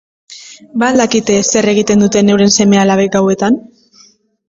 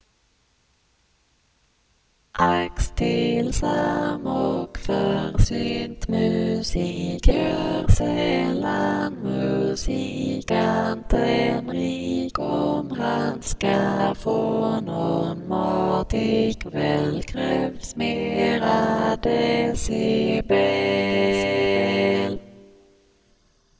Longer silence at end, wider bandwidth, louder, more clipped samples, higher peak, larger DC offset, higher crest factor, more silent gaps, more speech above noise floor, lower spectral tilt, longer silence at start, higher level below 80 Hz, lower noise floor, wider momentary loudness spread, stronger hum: second, 0.9 s vs 1.2 s; about the same, 7.8 kHz vs 8 kHz; first, -11 LUFS vs -23 LUFS; neither; about the same, 0 dBFS vs -2 dBFS; neither; second, 12 dB vs 20 dB; neither; second, 37 dB vs 43 dB; second, -4.5 dB/octave vs -6 dB/octave; second, 0.3 s vs 2.35 s; second, -48 dBFS vs -32 dBFS; second, -47 dBFS vs -64 dBFS; about the same, 8 LU vs 6 LU; neither